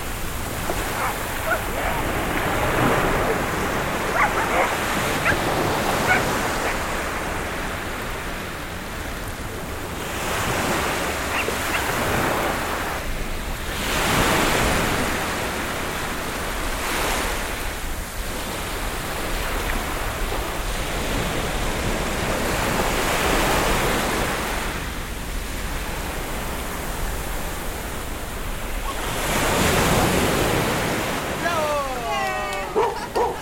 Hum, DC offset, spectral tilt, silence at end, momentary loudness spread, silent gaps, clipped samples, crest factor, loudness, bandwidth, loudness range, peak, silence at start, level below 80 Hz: none; under 0.1%; -3.5 dB/octave; 0 s; 10 LU; none; under 0.1%; 18 dB; -23 LUFS; 17 kHz; 7 LU; -6 dBFS; 0 s; -32 dBFS